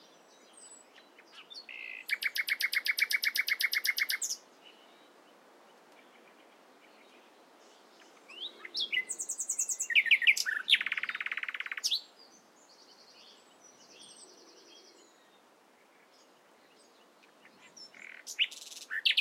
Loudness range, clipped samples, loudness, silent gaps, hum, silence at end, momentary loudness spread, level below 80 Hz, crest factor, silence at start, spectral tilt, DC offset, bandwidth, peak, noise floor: 12 LU; under 0.1%; -30 LUFS; none; none; 0 s; 25 LU; under -90 dBFS; 26 dB; 0.55 s; 3.5 dB/octave; under 0.1%; 16 kHz; -12 dBFS; -63 dBFS